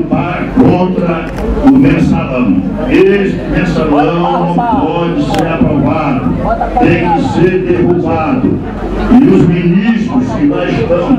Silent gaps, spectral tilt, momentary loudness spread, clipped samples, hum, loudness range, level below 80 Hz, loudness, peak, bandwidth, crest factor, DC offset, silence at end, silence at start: none; -8 dB/octave; 6 LU; 0.6%; none; 2 LU; -26 dBFS; -10 LUFS; 0 dBFS; 10.5 kHz; 10 dB; under 0.1%; 0 s; 0 s